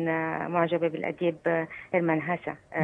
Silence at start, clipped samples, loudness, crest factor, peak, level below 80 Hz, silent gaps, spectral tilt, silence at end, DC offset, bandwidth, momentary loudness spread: 0 s; under 0.1%; -28 LUFS; 18 dB; -10 dBFS; -70 dBFS; none; -9 dB/octave; 0 s; under 0.1%; 4 kHz; 5 LU